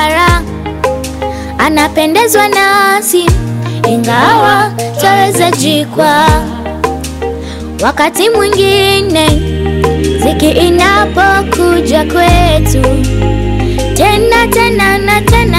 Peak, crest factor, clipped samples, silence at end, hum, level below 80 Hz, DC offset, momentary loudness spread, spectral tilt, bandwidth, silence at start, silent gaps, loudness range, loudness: 0 dBFS; 8 dB; 0.2%; 0 s; none; -20 dBFS; under 0.1%; 9 LU; -4.5 dB/octave; 16.5 kHz; 0 s; none; 2 LU; -9 LUFS